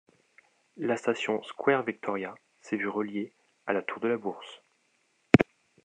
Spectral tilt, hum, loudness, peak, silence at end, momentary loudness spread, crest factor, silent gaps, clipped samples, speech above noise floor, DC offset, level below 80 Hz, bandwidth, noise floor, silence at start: -6.5 dB/octave; none; -30 LUFS; -2 dBFS; 0.4 s; 18 LU; 28 dB; none; under 0.1%; 41 dB; under 0.1%; -64 dBFS; 9.8 kHz; -71 dBFS; 0.75 s